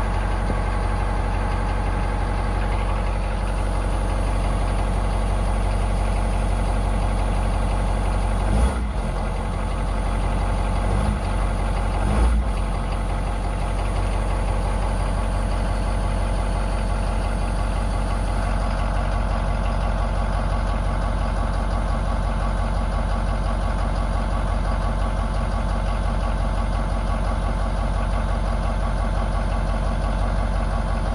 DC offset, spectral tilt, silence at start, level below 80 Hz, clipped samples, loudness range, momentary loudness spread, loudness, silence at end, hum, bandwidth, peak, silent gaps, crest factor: under 0.1%; -6.5 dB/octave; 0 s; -22 dBFS; under 0.1%; 1 LU; 1 LU; -25 LUFS; 0 s; none; 11.5 kHz; -8 dBFS; none; 12 dB